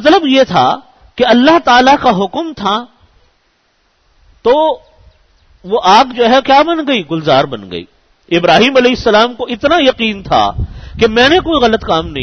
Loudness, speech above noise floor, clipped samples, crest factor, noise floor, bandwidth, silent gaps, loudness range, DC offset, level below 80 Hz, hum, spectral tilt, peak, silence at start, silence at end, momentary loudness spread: -10 LUFS; 47 dB; under 0.1%; 12 dB; -57 dBFS; 7.4 kHz; none; 6 LU; under 0.1%; -36 dBFS; none; -5 dB/octave; 0 dBFS; 0 s; 0 s; 11 LU